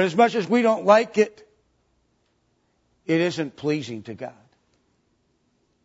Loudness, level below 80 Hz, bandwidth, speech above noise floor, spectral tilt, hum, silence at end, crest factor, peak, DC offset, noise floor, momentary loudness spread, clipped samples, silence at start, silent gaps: -22 LUFS; -72 dBFS; 8 kHz; 47 dB; -5.5 dB/octave; none; 1.55 s; 20 dB; -4 dBFS; under 0.1%; -68 dBFS; 19 LU; under 0.1%; 0 s; none